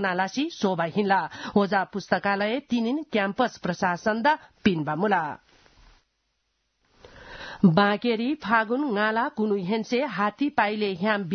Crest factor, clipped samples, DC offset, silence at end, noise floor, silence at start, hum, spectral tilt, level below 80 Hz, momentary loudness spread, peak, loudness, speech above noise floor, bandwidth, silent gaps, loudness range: 20 dB; under 0.1%; under 0.1%; 0 s; -75 dBFS; 0 s; none; -6 dB/octave; -62 dBFS; 4 LU; -6 dBFS; -25 LUFS; 50 dB; 6.6 kHz; none; 4 LU